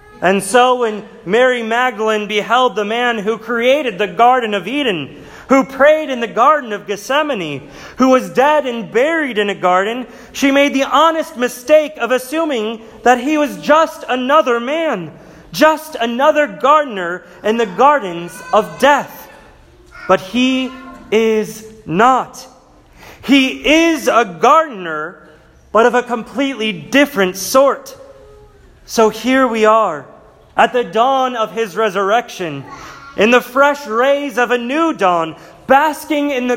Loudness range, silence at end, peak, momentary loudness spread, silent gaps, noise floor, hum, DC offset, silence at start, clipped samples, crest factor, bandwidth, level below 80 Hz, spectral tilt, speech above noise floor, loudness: 2 LU; 0 s; 0 dBFS; 12 LU; none; -45 dBFS; none; under 0.1%; 0.2 s; under 0.1%; 14 dB; 16.5 kHz; -52 dBFS; -4 dB/octave; 30 dB; -14 LUFS